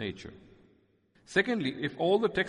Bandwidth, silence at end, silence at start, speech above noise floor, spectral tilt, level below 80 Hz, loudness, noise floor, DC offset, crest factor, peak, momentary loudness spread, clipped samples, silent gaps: 11 kHz; 0 s; 0 s; 37 dB; -5.5 dB/octave; -64 dBFS; -30 LUFS; -67 dBFS; under 0.1%; 20 dB; -12 dBFS; 17 LU; under 0.1%; none